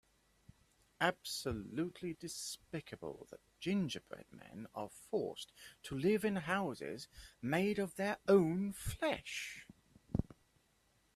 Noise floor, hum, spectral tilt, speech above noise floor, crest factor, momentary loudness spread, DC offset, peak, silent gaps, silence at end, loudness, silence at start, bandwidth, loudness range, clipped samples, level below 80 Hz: -75 dBFS; none; -5 dB/octave; 36 dB; 22 dB; 18 LU; under 0.1%; -18 dBFS; none; 0.9 s; -39 LUFS; 1 s; 14.5 kHz; 7 LU; under 0.1%; -60 dBFS